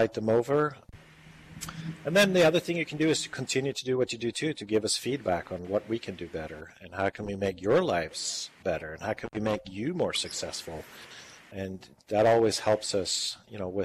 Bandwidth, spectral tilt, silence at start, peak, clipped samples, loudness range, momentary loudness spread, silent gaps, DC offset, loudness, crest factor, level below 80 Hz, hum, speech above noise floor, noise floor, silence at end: 15.5 kHz; -4 dB/octave; 0 s; -14 dBFS; under 0.1%; 6 LU; 17 LU; none; under 0.1%; -29 LUFS; 16 dB; -62 dBFS; none; 23 dB; -52 dBFS; 0 s